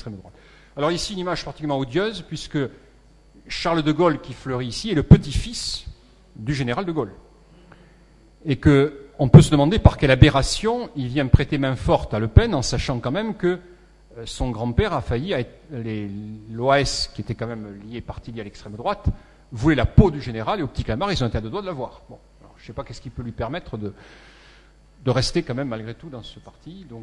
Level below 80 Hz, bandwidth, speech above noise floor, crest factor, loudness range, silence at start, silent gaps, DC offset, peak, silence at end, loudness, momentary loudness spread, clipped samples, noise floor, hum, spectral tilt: -32 dBFS; 11.5 kHz; 31 dB; 22 dB; 12 LU; 0 s; none; under 0.1%; 0 dBFS; 0 s; -21 LUFS; 19 LU; under 0.1%; -52 dBFS; none; -6.5 dB/octave